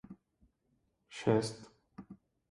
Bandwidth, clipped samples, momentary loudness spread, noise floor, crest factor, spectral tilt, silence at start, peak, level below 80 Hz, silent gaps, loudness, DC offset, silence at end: 11.5 kHz; under 0.1%; 25 LU; -78 dBFS; 24 dB; -6 dB/octave; 0.1 s; -16 dBFS; -70 dBFS; none; -34 LUFS; under 0.1%; 0.35 s